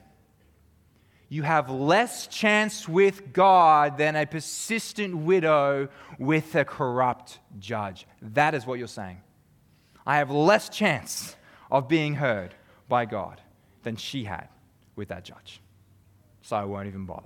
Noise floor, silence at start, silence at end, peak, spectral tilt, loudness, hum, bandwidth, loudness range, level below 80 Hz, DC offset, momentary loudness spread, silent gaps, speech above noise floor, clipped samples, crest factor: -61 dBFS; 1.3 s; 0.05 s; -6 dBFS; -5 dB/octave; -24 LUFS; none; 18.5 kHz; 12 LU; -66 dBFS; under 0.1%; 18 LU; none; 36 dB; under 0.1%; 20 dB